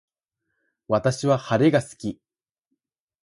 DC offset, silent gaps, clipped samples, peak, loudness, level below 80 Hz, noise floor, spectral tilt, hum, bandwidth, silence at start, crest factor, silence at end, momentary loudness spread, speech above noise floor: under 0.1%; none; under 0.1%; -6 dBFS; -22 LUFS; -58 dBFS; -80 dBFS; -6.5 dB/octave; none; 11.5 kHz; 0.9 s; 20 dB; 1.1 s; 14 LU; 58 dB